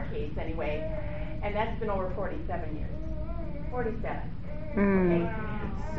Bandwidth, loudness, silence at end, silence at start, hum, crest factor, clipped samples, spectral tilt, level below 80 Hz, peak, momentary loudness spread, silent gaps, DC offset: 6.4 kHz; -32 LUFS; 0 s; 0 s; none; 16 dB; under 0.1%; -7 dB/octave; -38 dBFS; -14 dBFS; 11 LU; none; 2%